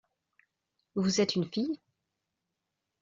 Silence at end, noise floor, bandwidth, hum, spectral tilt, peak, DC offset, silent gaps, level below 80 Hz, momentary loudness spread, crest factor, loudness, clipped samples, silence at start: 1.25 s; -85 dBFS; 7.6 kHz; none; -5.5 dB/octave; -16 dBFS; under 0.1%; none; -72 dBFS; 11 LU; 18 dB; -31 LUFS; under 0.1%; 0.95 s